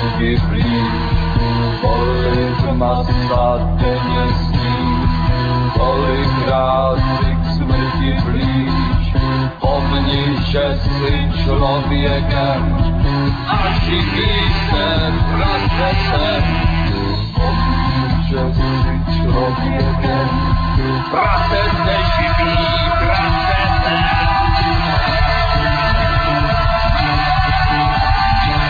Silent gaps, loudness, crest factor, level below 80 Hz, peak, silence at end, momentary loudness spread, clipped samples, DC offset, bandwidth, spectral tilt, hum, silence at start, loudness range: none; -16 LUFS; 14 dB; -20 dBFS; -2 dBFS; 0 s; 3 LU; under 0.1%; under 0.1%; 5 kHz; -8 dB/octave; none; 0 s; 2 LU